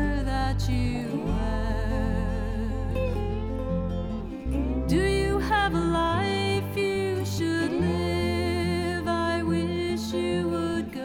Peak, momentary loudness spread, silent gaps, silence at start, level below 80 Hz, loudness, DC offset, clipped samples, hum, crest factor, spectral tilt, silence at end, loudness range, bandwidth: -12 dBFS; 6 LU; none; 0 s; -34 dBFS; -27 LUFS; under 0.1%; under 0.1%; none; 14 dB; -6.5 dB/octave; 0 s; 4 LU; 17 kHz